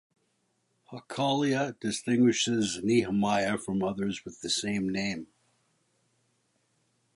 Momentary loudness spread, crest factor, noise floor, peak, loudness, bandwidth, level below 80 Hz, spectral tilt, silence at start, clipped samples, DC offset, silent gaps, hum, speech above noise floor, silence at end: 11 LU; 18 dB; -74 dBFS; -14 dBFS; -28 LUFS; 11.5 kHz; -64 dBFS; -4.5 dB/octave; 0.9 s; under 0.1%; under 0.1%; none; none; 46 dB; 1.9 s